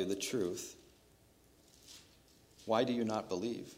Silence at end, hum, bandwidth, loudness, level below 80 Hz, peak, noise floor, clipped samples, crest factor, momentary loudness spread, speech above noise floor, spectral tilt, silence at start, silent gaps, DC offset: 0 s; none; 16 kHz; -37 LUFS; -72 dBFS; -18 dBFS; -66 dBFS; under 0.1%; 22 dB; 22 LU; 30 dB; -4.5 dB/octave; 0 s; none; under 0.1%